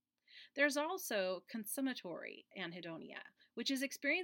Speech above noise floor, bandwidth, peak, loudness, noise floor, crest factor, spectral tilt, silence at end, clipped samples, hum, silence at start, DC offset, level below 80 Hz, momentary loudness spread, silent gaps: 22 dB; 17 kHz; -20 dBFS; -40 LUFS; -63 dBFS; 22 dB; -2.5 dB/octave; 0 s; under 0.1%; none; 0.3 s; under 0.1%; under -90 dBFS; 16 LU; none